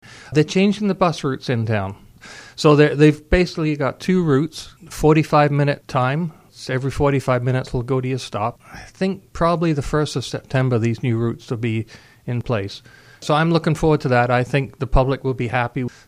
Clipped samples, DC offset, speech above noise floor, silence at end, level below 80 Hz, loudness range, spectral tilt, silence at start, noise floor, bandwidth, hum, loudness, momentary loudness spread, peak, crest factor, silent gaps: under 0.1%; under 0.1%; 22 dB; 0.2 s; -34 dBFS; 5 LU; -7 dB/octave; 0.1 s; -41 dBFS; 14.5 kHz; none; -19 LUFS; 12 LU; 0 dBFS; 18 dB; none